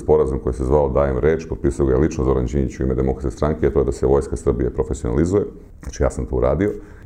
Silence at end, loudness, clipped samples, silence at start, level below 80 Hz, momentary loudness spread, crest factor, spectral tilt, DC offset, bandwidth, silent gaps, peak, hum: 0.05 s; -20 LUFS; under 0.1%; 0 s; -28 dBFS; 6 LU; 16 dB; -8 dB/octave; under 0.1%; 10 kHz; none; -2 dBFS; none